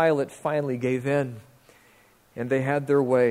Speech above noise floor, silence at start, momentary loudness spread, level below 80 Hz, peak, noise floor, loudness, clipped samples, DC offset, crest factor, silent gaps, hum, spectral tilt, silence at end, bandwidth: 34 dB; 0 s; 13 LU; -66 dBFS; -8 dBFS; -58 dBFS; -25 LUFS; under 0.1%; under 0.1%; 16 dB; none; none; -7.5 dB/octave; 0 s; 15 kHz